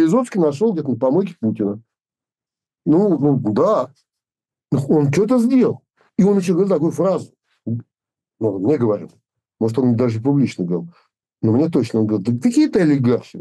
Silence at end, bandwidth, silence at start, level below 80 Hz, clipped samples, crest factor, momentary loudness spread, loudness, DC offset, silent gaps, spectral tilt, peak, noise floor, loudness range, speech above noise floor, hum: 0 s; 12 kHz; 0 s; -60 dBFS; under 0.1%; 12 dB; 10 LU; -18 LUFS; under 0.1%; none; -8 dB/octave; -6 dBFS; under -90 dBFS; 3 LU; over 73 dB; none